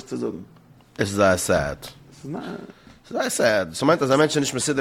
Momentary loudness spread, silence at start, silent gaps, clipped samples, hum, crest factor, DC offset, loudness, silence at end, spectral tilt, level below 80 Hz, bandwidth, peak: 19 LU; 0 s; none; under 0.1%; none; 18 dB; under 0.1%; -22 LUFS; 0 s; -4 dB/octave; -52 dBFS; 17 kHz; -4 dBFS